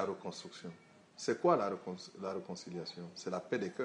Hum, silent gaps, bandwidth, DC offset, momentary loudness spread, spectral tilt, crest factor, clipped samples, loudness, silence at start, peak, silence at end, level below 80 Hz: none; none; 10.5 kHz; under 0.1%; 18 LU; -5 dB/octave; 22 dB; under 0.1%; -38 LUFS; 0 s; -16 dBFS; 0 s; -84 dBFS